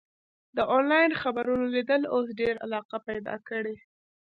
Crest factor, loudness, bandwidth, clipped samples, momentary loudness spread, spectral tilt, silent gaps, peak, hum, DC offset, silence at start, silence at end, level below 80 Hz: 18 dB; -27 LUFS; 5.2 kHz; under 0.1%; 12 LU; -7 dB/octave; 2.85-2.89 s; -10 dBFS; none; under 0.1%; 0.55 s; 0.45 s; -64 dBFS